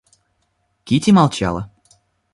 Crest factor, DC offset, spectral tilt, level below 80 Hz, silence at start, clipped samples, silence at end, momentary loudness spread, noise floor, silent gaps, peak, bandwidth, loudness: 18 dB; under 0.1%; -6 dB/octave; -44 dBFS; 0.85 s; under 0.1%; 0.7 s; 15 LU; -67 dBFS; none; -2 dBFS; 11.5 kHz; -16 LUFS